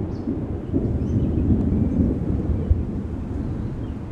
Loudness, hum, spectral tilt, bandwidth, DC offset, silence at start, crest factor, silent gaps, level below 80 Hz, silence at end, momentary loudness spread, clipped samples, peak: -24 LUFS; none; -11 dB/octave; 6 kHz; under 0.1%; 0 s; 16 dB; none; -30 dBFS; 0 s; 8 LU; under 0.1%; -6 dBFS